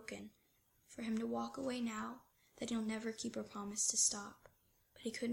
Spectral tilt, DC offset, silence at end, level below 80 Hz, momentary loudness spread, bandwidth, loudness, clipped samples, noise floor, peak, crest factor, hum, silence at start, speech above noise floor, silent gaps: -2.5 dB/octave; under 0.1%; 0 s; -74 dBFS; 18 LU; 16.5 kHz; -40 LUFS; under 0.1%; -76 dBFS; -22 dBFS; 20 dB; none; 0 s; 35 dB; none